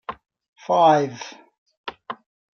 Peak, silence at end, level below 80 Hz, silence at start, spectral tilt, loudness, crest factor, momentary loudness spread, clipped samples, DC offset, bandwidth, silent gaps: -4 dBFS; 0.4 s; -68 dBFS; 0.1 s; -5.5 dB/octave; -19 LUFS; 20 dB; 22 LU; under 0.1%; under 0.1%; 6.8 kHz; 0.48-0.53 s, 1.58-1.66 s, 1.77-1.84 s